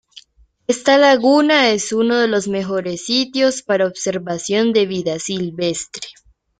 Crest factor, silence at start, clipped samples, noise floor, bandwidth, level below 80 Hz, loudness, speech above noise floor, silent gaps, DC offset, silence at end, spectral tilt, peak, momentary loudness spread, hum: 16 dB; 0.15 s; under 0.1%; -46 dBFS; 9.6 kHz; -58 dBFS; -17 LUFS; 29 dB; none; under 0.1%; 0.5 s; -3.5 dB/octave; 0 dBFS; 11 LU; none